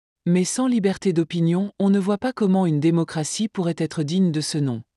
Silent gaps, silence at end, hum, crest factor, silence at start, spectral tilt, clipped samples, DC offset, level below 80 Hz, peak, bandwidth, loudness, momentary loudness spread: none; 0.15 s; none; 12 dB; 0.25 s; -6 dB/octave; under 0.1%; under 0.1%; -64 dBFS; -8 dBFS; 12 kHz; -22 LUFS; 5 LU